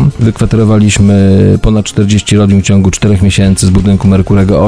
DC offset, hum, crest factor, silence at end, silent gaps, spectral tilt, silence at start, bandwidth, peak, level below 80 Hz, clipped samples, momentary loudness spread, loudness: 2%; none; 6 dB; 0 s; none; -6.5 dB/octave; 0 s; 11 kHz; 0 dBFS; -22 dBFS; 2%; 3 LU; -8 LUFS